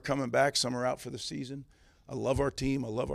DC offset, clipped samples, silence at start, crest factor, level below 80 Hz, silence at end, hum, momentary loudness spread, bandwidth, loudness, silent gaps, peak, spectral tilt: under 0.1%; under 0.1%; 0.05 s; 18 dB; -52 dBFS; 0 s; none; 14 LU; 15 kHz; -31 LUFS; none; -14 dBFS; -4.5 dB/octave